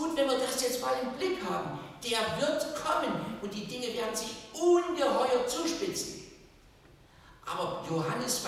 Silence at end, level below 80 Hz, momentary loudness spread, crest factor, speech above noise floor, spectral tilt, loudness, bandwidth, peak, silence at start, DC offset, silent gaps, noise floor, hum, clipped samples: 0 s; -62 dBFS; 11 LU; 16 dB; 26 dB; -3.5 dB/octave; -31 LUFS; 16 kHz; -16 dBFS; 0 s; under 0.1%; none; -58 dBFS; none; under 0.1%